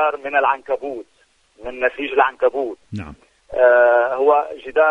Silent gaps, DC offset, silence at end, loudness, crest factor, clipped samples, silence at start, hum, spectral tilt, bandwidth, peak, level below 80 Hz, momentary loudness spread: none; under 0.1%; 0 s; -18 LUFS; 18 dB; under 0.1%; 0 s; none; -6 dB/octave; 6 kHz; 0 dBFS; -52 dBFS; 19 LU